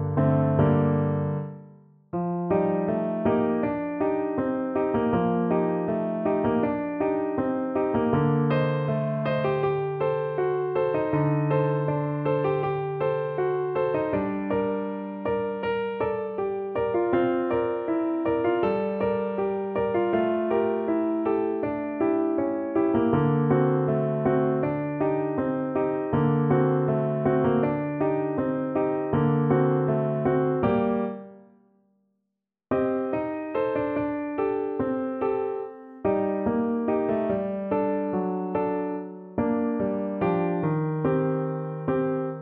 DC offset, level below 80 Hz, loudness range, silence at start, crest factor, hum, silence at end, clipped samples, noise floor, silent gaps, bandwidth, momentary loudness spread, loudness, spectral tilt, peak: under 0.1%; -56 dBFS; 3 LU; 0 s; 16 dB; none; 0 s; under 0.1%; -82 dBFS; none; 4.5 kHz; 6 LU; -26 LUFS; -12 dB/octave; -8 dBFS